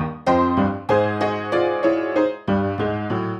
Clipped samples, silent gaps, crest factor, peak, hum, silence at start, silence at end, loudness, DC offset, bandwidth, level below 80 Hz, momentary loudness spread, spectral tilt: under 0.1%; none; 14 dB; -6 dBFS; none; 0 s; 0 s; -21 LUFS; under 0.1%; 8.8 kHz; -48 dBFS; 5 LU; -7.5 dB/octave